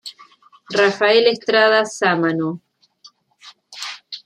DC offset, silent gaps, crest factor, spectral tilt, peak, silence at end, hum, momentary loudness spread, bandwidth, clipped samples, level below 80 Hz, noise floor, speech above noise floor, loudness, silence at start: under 0.1%; none; 18 dB; -4 dB/octave; -2 dBFS; 0.1 s; none; 18 LU; 11.5 kHz; under 0.1%; -72 dBFS; -51 dBFS; 35 dB; -16 LUFS; 0.05 s